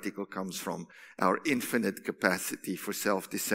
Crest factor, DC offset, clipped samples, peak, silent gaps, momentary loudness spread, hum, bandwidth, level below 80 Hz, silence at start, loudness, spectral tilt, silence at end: 24 dB; under 0.1%; under 0.1%; -8 dBFS; none; 9 LU; none; 16 kHz; -78 dBFS; 0 s; -32 LUFS; -3.5 dB/octave; 0 s